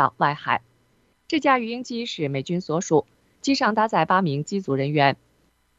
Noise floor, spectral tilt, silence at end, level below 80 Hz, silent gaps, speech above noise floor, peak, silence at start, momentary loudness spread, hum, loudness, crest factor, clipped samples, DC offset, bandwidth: -64 dBFS; -5.5 dB/octave; 0.65 s; -66 dBFS; none; 42 dB; -2 dBFS; 0 s; 8 LU; none; -23 LUFS; 22 dB; under 0.1%; under 0.1%; 8.2 kHz